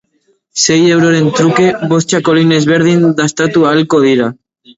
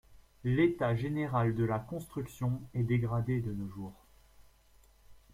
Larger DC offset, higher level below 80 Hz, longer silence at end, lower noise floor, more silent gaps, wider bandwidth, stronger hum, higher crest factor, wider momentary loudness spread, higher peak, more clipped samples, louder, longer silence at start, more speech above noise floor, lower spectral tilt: neither; first, -52 dBFS vs -58 dBFS; first, 0.45 s vs 0.15 s; second, -58 dBFS vs -63 dBFS; neither; second, 8 kHz vs 15 kHz; neither; second, 10 dB vs 18 dB; second, 4 LU vs 12 LU; first, 0 dBFS vs -16 dBFS; neither; first, -10 LUFS vs -33 LUFS; first, 0.55 s vs 0.1 s; first, 48 dB vs 31 dB; second, -5 dB/octave vs -8.5 dB/octave